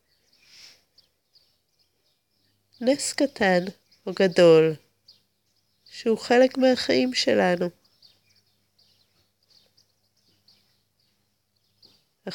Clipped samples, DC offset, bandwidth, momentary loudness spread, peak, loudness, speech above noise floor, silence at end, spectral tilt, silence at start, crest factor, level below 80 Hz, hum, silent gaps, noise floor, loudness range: under 0.1%; under 0.1%; 17 kHz; 20 LU; -6 dBFS; -22 LUFS; 51 dB; 0 s; -4.5 dB/octave; 2.8 s; 20 dB; -72 dBFS; none; none; -72 dBFS; 9 LU